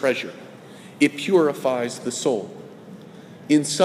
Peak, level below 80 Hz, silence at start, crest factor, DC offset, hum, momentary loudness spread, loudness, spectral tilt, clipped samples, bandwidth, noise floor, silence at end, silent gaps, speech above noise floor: -4 dBFS; -74 dBFS; 0 s; 20 dB; under 0.1%; none; 23 LU; -22 LUFS; -4 dB/octave; under 0.1%; 15.5 kHz; -42 dBFS; 0 s; none; 22 dB